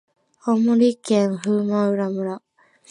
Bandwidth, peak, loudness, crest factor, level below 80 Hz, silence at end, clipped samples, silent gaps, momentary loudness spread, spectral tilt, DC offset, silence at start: 11 kHz; -6 dBFS; -21 LUFS; 14 dB; -72 dBFS; 0.5 s; under 0.1%; none; 12 LU; -7 dB/octave; under 0.1%; 0.45 s